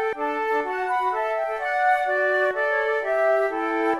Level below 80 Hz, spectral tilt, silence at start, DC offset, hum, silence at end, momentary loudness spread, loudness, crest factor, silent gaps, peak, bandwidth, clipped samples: -60 dBFS; -3.5 dB/octave; 0 s; 0.1%; none; 0 s; 4 LU; -23 LUFS; 14 dB; none; -10 dBFS; 13 kHz; under 0.1%